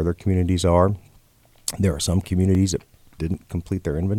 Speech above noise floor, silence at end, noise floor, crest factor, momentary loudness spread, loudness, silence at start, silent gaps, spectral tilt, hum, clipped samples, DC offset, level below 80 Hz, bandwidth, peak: 34 dB; 0 s; -55 dBFS; 18 dB; 11 LU; -22 LUFS; 0 s; none; -6 dB/octave; none; under 0.1%; under 0.1%; -38 dBFS; 15 kHz; -4 dBFS